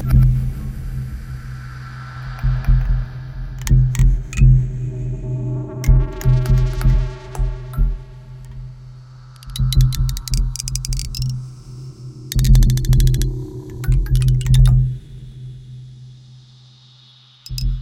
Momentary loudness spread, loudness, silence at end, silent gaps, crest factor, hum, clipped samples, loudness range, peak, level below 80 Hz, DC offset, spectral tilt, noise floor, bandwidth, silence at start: 21 LU; -19 LUFS; 0 s; none; 16 dB; none; under 0.1%; 6 LU; -2 dBFS; -20 dBFS; under 0.1%; -6 dB/octave; -48 dBFS; 16.5 kHz; 0 s